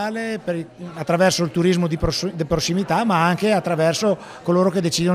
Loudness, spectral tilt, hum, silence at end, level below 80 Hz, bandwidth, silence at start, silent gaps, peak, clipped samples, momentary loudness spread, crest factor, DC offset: -20 LUFS; -5 dB/octave; none; 0 s; -42 dBFS; 15.5 kHz; 0 s; none; -4 dBFS; under 0.1%; 8 LU; 16 dB; under 0.1%